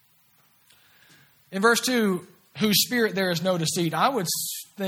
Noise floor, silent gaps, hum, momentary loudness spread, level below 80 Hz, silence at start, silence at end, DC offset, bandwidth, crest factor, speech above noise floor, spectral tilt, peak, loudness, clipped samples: -62 dBFS; none; none; 10 LU; -68 dBFS; 1.5 s; 0 s; under 0.1%; over 20 kHz; 20 dB; 38 dB; -3.5 dB/octave; -6 dBFS; -23 LUFS; under 0.1%